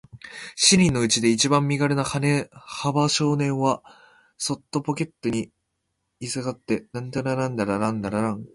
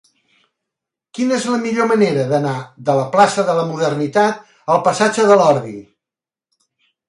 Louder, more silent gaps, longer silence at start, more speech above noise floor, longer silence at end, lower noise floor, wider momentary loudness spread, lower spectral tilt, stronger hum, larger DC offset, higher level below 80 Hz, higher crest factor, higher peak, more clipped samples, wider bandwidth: second, -23 LUFS vs -16 LUFS; neither; second, 0.15 s vs 1.15 s; second, 53 dB vs 74 dB; second, 0.1 s vs 1.25 s; second, -77 dBFS vs -89 dBFS; about the same, 12 LU vs 11 LU; about the same, -4 dB/octave vs -5 dB/octave; neither; neither; first, -54 dBFS vs -64 dBFS; about the same, 20 dB vs 18 dB; second, -4 dBFS vs 0 dBFS; neither; about the same, 11.5 kHz vs 11.5 kHz